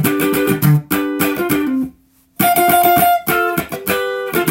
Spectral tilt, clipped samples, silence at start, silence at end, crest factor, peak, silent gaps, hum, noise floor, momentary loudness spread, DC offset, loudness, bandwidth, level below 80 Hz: -5 dB/octave; under 0.1%; 0 s; 0 s; 16 dB; 0 dBFS; none; none; -48 dBFS; 8 LU; under 0.1%; -15 LUFS; 17 kHz; -48 dBFS